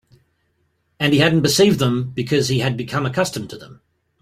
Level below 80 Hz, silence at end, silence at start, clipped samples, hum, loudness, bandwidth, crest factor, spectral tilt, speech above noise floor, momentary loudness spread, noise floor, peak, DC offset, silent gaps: -52 dBFS; 0.45 s; 1 s; under 0.1%; none; -18 LUFS; 16 kHz; 18 dB; -5 dB/octave; 49 dB; 10 LU; -66 dBFS; -2 dBFS; under 0.1%; none